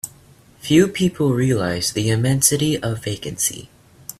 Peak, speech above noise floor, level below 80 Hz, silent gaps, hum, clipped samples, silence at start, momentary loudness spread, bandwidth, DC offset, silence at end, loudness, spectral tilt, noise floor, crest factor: 0 dBFS; 31 dB; -50 dBFS; none; none; under 0.1%; 0.05 s; 16 LU; 15.5 kHz; under 0.1%; 0.05 s; -19 LUFS; -4.5 dB/octave; -49 dBFS; 20 dB